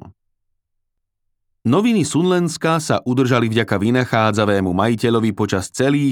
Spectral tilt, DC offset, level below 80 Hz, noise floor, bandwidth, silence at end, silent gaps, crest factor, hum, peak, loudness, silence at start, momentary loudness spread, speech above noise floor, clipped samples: -6 dB/octave; under 0.1%; -60 dBFS; -73 dBFS; 17 kHz; 0 s; none; 16 dB; none; -2 dBFS; -17 LUFS; 0.05 s; 3 LU; 56 dB; under 0.1%